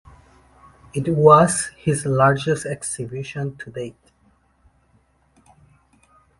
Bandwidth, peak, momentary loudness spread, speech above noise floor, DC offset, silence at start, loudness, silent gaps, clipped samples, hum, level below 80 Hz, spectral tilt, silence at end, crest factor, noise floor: 11.5 kHz; 0 dBFS; 19 LU; 42 dB; under 0.1%; 0.95 s; -19 LUFS; none; under 0.1%; none; -52 dBFS; -5.5 dB/octave; 2.5 s; 22 dB; -60 dBFS